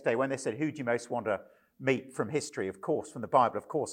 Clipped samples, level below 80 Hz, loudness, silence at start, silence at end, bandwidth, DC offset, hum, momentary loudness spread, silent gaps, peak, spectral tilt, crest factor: under 0.1%; -76 dBFS; -32 LUFS; 0 s; 0 s; 16 kHz; under 0.1%; none; 8 LU; none; -10 dBFS; -5.5 dB/octave; 22 dB